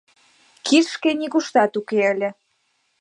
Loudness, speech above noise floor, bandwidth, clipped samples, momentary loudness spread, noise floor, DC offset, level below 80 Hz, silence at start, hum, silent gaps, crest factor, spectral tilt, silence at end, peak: -20 LUFS; 49 dB; 11 kHz; under 0.1%; 8 LU; -68 dBFS; under 0.1%; -74 dBFS; 0.65 s; none; none; 18 dB; -3.5 dB/octave; 0.7 s; -4 dBFS